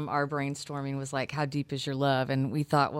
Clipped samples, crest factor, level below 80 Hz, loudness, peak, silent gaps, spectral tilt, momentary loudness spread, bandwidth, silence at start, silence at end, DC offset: under 0.1%; 18 dB; -66 dBFS; -30 LUFS; -12 dBFS; none; -6 dB/octave; 7 LU; 13 kHz; 0 s; 0 s; under 0.1%